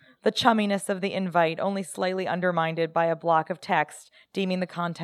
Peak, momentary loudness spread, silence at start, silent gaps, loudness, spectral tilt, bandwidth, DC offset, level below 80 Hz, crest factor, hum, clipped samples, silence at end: -4 dBFS; 7 LU; 0.25 s; none; -26 LUFS; -5 dB/octave; 14 kHz; under 0.1%; -72 dBFS; 22 dB; none; under 0.1%; 0 s